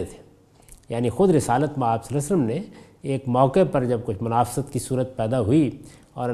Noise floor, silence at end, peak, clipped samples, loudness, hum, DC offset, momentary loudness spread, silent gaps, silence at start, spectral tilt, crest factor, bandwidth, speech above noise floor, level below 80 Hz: -52 dBFS; 0 s; -4 dBFS; under 0.1%; -23 LUFS; none; under 0.1%; 13 LU; none; 0 s; -7 dB/octave; 18 dB; 14.5 kHz; 30 dB; -48 dBFS